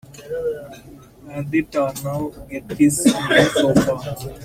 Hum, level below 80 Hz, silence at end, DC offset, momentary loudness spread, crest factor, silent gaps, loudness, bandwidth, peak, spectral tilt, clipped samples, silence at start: none; -46 dBFS; 0 s; under 0.1%; 16 LU; 20 dB; none; -19 LUFS; 16.5 kHz; -2 dBFS; -4.5 dB/octave; under 0.1%; 0.1 s